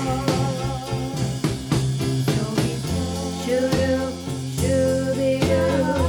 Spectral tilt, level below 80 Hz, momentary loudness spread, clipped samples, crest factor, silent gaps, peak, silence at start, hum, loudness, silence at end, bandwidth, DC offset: -6 dB/octave; -38 dBFS; 7 LU; under 0.1%; 16 dB; none; -6 dBFS; 0 s; none; -23 LUFS; 0 s; 18.5 kHz; under 0.1%